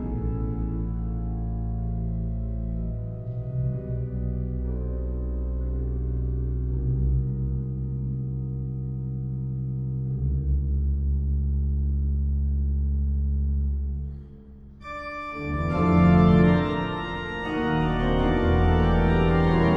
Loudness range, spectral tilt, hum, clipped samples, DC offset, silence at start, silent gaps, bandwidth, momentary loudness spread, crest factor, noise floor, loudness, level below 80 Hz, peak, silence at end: 8 LU; -9.5 dB/octave; none; under 0.1%; under 0.1%; 0 s; none; 5 kHz; 10 LU; 18 dB; -44 dBFS; -26 LUFS; -28 dBFS; -6 dBFS; 0 s